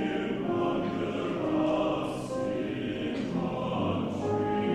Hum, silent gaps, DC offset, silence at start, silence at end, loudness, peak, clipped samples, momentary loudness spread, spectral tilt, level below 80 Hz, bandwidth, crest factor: none; none; under 0.1%; 0 s; 0 s; -30 LUFS; -16 dBFS; under 0.1%; 5 LU; -7 dB/octave; -56 dBFS; 12 kHz; 14 dB